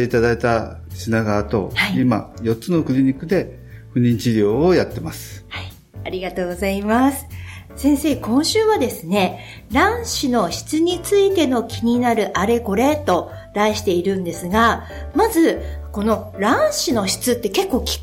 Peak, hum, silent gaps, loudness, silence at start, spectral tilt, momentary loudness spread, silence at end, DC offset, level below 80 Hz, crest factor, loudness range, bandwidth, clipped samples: -4 dBFS; none; none; -19 LUFS; 0 s; -5 dB/octave; 13 LU; 0 s; under 0.1%; -38 dBFS; 14 dB; 3 LU; 17 kHz; under 0.1%